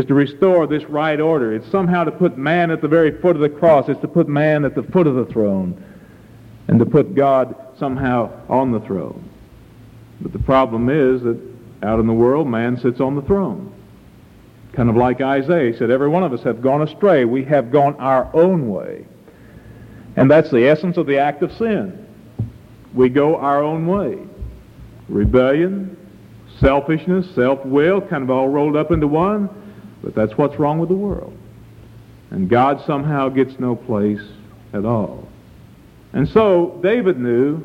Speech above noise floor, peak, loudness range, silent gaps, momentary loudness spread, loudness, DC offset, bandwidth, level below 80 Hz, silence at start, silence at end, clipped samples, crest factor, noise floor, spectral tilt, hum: 28 dB; -2 dBFS; 4 LU; none; 13 LU; -17 LUFS; under 0.1%; 7.8 kHz; -40 dBFS; 0 s; 0 s; under 0.1%; 16 dB; -44 dBFS; -9 dB/octave; none